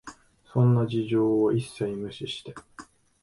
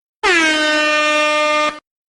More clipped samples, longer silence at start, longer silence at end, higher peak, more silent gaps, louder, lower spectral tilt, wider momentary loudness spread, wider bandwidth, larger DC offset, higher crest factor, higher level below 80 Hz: neither; second, 0.05 s vs 0.25 s; about the same, 0.4 s vs 0.3 s; second, -10 dBFS vs -2 dBFS; neither; second, -26 LUFS vs -14 LUFS; first, -8 dB/octave vs -0.5 dB/octave; first, 19 LU vs 4 LU; about the same, 11.5 kHz vs 12 kHz; neither; about the same, 16 dB vs 14 dB; second, -60 dBFS vs -52 dBFS